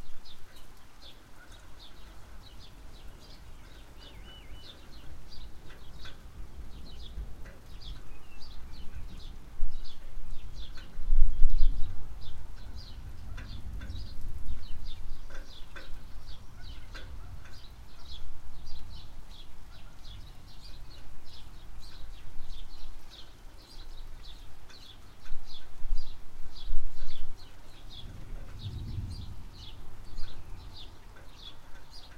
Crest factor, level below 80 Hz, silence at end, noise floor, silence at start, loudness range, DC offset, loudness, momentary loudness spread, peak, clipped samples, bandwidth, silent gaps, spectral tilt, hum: 22 dB; -34 dBFS; 0.05 s; -47 dBFS; 0 s; 13 LU; under 0.1%; -45 LUFS; 11 LU; -4 dBFS; under 0.1%; 5.2 kHz; none; -5 dB/octave; none